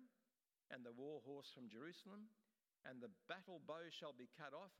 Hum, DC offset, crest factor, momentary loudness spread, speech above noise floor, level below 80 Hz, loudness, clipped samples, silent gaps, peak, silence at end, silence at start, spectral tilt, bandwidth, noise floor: none; under 0.1%; 22 dB; 7 LU; over 33 dB; under -90 dBFS; -57 LUFS; under 0.1%; none; -36 dBFS; 0 s; 0 s; -5 dB/octave; 15.5 kHz; under -90 dBFS